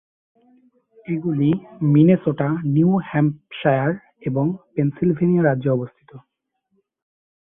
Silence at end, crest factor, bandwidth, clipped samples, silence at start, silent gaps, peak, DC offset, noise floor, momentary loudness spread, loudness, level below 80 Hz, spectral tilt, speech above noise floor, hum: 1.3 s; 18 dB; 3.7 kHz; under 0.1%; 1.1 s; none; -4 dBFS; under 0.1%; -71 dBFS; 10 LU; -20 LUFS; -58 dBFS; -13 dB/octave; 52 dB; none